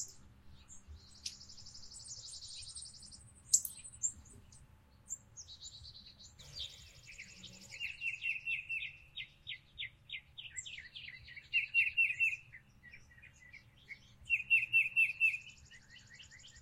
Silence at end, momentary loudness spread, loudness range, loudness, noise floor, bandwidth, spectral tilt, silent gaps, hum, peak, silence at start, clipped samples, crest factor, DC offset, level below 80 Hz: 0 s; 27 LU; 15 LU; -35 LUFS; -62 dBFS; 16 kHz; 1.5 dB/octave; none; none; -14 dBFS; 0 s; under 0.1%; 28 dB; under 0.1%; -66 dBFS